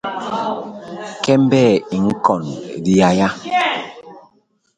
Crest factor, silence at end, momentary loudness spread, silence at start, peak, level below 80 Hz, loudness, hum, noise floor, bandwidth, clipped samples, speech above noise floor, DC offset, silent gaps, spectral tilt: 18 dB; 0.55 s; 15 LU; 0.05 s; 0 dBFS; -52 dBFS; -17 LUFS; none; -59 dBFS; 9.4 kHz; under 0.1%; 45 dB; under 0.1%; none; -6 dB/octave